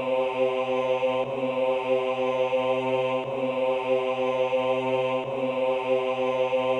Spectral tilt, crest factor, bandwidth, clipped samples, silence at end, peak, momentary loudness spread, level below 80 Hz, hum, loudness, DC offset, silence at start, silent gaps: -6 dB/octave; 12 dB; 8.4 kHz; under 0.1%; 0 s; -12 dBFS; 3 LU; -66 dBFS; none; -26 LUFS; under 0.1%; 0 s; none